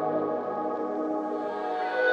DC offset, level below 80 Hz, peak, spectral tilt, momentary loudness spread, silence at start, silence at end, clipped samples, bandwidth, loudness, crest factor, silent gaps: under 0.1%; -78 dBFS; -12 dBFS; -6.5 dB/octave; 3 LU; 0 s; 0 s; under 0.1%; 7.6 kHz; -30 LUFS; 16 dB; none